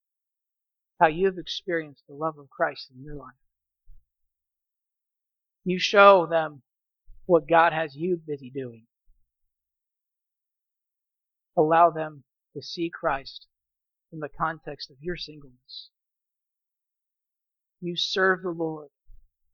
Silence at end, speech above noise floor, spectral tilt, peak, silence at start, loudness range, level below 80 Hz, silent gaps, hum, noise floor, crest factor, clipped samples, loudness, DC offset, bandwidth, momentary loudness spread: 0.7 s; 63 dB; -5 dB/octave; -2 dBFS; 1 s; 15 LU; -56 dBFS; none; none; -87 dBFS; 26 dB; under 0.1%; -24 LUFS; under 0.1%; 7.2 kHz; 23 LU